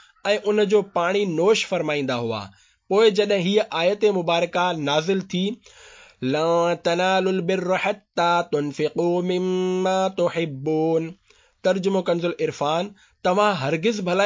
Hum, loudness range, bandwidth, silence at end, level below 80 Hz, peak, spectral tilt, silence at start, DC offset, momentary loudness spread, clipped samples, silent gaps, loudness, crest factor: none; 2 LU; 7.6 kHz; 0 s; -66 dBFS; -6 dBFS; -5.5 dB/octave; 0.25 s; under 0.1%; 7 LU; under 0.1%; none; -22 LUFS; 16 dB